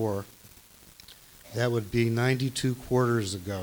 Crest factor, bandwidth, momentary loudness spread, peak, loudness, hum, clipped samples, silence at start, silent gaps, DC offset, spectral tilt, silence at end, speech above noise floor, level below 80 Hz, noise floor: 18 dB; over 20 kHz; 23 LU; -12 dBFS; -28 LUFS; none; under 0.1%; 0 s; none; under 0.1%; -6 dB/octave; 0 s; 26 dB; -56 dBFS; -53 dBFS